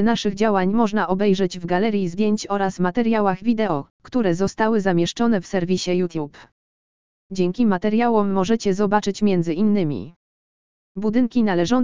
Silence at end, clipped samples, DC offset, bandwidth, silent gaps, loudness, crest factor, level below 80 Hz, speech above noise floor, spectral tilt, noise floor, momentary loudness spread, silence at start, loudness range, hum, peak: 0 s; under 0.1%; 2%; 7.6 kHz; 3.90-4.00 s, 6.52-7.30 s, 10.16-10.95 s; -21 LUFS; 18 dB; -50 dBFS; over 70 dB; -6.5 dB/octave; under -90 dBFS; 7 LU; 0 s; 2 LU; none; -2 dBFS